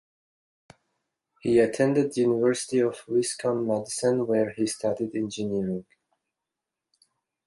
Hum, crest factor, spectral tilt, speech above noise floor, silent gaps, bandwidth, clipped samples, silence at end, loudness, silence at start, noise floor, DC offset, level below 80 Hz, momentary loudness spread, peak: none; 18 dB; -5 dB/octave; 62 dB; none; 11.5 kHz; under 0.1%; 1.65 s; -26 LUFS; 1.45 s; -87 dBFS; under 0.1%; -66 dBFS; 7 LU; -8 dBFS